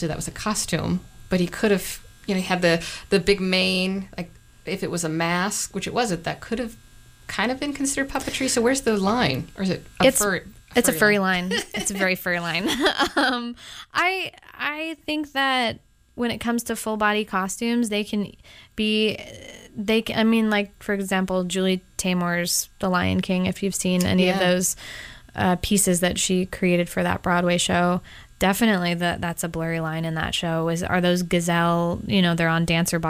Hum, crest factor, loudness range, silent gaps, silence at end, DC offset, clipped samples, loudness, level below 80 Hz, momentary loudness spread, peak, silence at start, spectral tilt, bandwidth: none; 18 dB; 4 LU; none; 0 s; under 0.1%; under 0.1%; -23 LUFS; -46 dBFS; 9 LU; -6 dBFS; 0 s; -4 dB/octave; 16 kHz